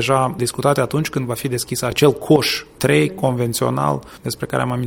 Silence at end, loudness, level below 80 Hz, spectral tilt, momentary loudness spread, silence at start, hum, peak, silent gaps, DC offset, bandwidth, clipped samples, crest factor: 0 s; -19 LUFS; -48 dBFS; -5 dB/octave; 7 LU; 0 s; none; 0 dBFS; none; under 0.1%; 17 kHz; under 0.1%; 18 dB